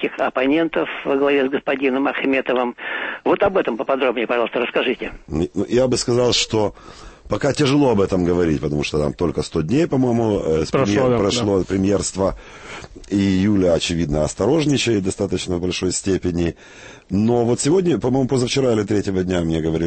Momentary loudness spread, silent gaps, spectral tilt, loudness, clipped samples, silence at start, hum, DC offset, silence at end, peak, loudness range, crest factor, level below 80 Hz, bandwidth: 7 LU; none; -5.5 dB/octave; -19 LUFS; under 0.1%; 0 s; none; under 0.1%; 0 s; -6 dBFS; 2 LU; 14 dB; -40 dBFS; 8.8 kHz